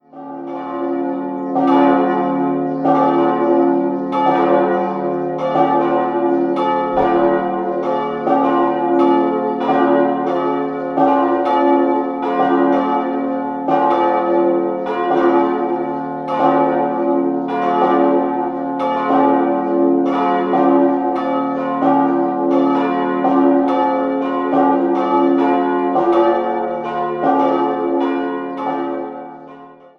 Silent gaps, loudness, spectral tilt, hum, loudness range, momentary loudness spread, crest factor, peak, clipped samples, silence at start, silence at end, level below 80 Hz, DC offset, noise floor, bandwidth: none; -16 LUFS; -8 dB/octave; none; 1 LU; 7 LU; 14 dB; 0 dBFS; under 0.1%; 0.15 s; 0.25 s; -56 dBFS; under 0.1%; -39 dBFS; 5.8 kHz